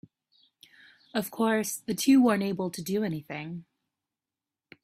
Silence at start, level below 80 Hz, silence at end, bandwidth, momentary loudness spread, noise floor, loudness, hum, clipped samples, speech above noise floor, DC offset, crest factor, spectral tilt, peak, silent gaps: 1.15 s; -70 dBFS; 1.2 s; 16 kHz; 16 LU; under -90 dBFS; -27 LUFS; none; under 0.1%; over 63 dB; under 0.1%; 18 dB; -5 dB/octave; -12 dBFS; none